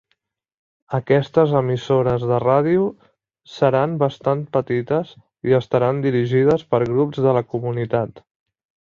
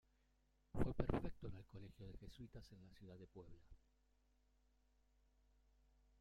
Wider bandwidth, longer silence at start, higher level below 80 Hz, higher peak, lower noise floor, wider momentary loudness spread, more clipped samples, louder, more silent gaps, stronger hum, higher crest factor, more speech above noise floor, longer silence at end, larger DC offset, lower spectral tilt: second, 7.2 kHz vs 10 kHz; first, 0.9 s vs 0.75 s; about the same, -54 dBFS vs -58 dBFS; first, -2 dBFS vs -22 dBFS; second, -71 dBFS vs -80 dBFS; second, 8 LU vs 19 LU; neither; first, -19 LUFS vs -50 LUFS; neither; neither; second, 18 dB vs 28 dB; first, 53 dB vs 20 dB; second, 0.65 s vs 2.45 s; neither; about the same, -8.5 dB/octave vs -8.5 dB/octave